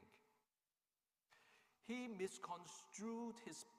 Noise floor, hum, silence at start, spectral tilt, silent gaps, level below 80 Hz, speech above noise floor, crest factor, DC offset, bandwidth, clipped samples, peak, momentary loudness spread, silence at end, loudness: under -90 dBFS; none; 0 s; -4 dB/octave; none; under -90 dBFS; over 39 dB; 20 dB; under 0.1%; 15.5 kHz; under 0.1%; -34 dBFS; 7 LU; 0 s; -51 LUFS